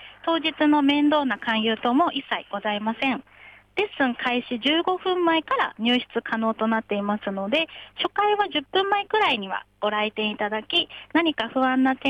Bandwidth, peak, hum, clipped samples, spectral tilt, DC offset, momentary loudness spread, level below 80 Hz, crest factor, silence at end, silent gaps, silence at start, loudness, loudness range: 8.8 kHz; -10 dBFS; none; under 0.1%; -5.5 dB/octave; under 0.1%; 7 LU; -64 dBFS; 14 dB; 0 s; none; 0 s; -23 LUFS; 2 LU